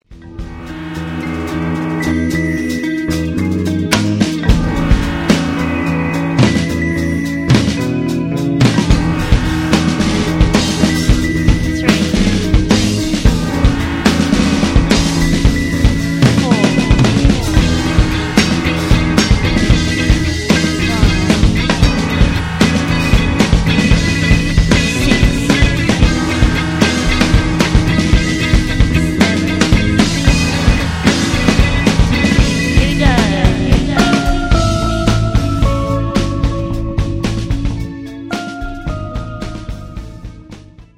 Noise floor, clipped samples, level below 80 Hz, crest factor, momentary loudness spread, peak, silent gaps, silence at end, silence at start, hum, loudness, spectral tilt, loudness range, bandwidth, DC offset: -36 dBFS; under 0.1%; -18 dBFS; 12 dB; 8 LU; 0 dBFS; none; 0.15 s; 0.1 s; none; -14 LUFS; -5.5 dB/octave; 5 LU; 15.5 kHz; under 0.1%